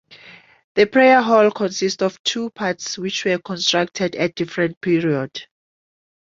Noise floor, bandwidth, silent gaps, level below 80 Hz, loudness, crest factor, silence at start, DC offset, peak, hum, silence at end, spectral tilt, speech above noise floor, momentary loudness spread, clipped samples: -46 dBFS; 7.8 kHz; 0.64-0.75 s, 2.19-2.24 s, 4.77-4.81 s; -62 dBFS; -19 LUFS; 18 dB; 0.1 s; under 0.1%; -2 dBFS; none; 0.9 s; -4 dB/octave; 27 dB; 11 LU; under 0.1%